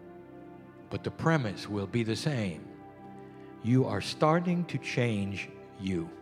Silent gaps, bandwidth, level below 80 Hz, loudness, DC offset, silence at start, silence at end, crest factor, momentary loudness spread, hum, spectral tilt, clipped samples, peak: none; 13 kHz; -64 dBFS; -31 LUFS; under 0.1%; 0 s; 0 s; 22 dB; 21 LU; none; -6.5 dB/octave; under 0.1%; -10 dBFS